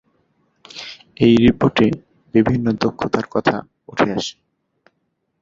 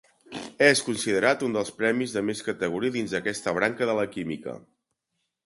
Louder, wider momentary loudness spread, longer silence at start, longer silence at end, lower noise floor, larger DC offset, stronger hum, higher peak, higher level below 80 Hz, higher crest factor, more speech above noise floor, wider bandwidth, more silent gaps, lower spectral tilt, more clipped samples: first, -18 LUFS vs -25 LUFS; first, 20 LU vs 17 LU; first, 0.75 s vs 0.3 s; first, 1.1 s vs 0.85 s; second, -71 dBFS vs -80 dBFS; neither; neither; first, 0 dBFS vs -4 dBFS; first, -46 dBFS vs -64 dBFS; about the same, 18 dB vs 22 dB; about the same, 54 dB vs 54 dB; second, 7.6 kHz vs 11.5 kHz; neither; first, -6.5 dB/octave vs -4 dB/octave; neither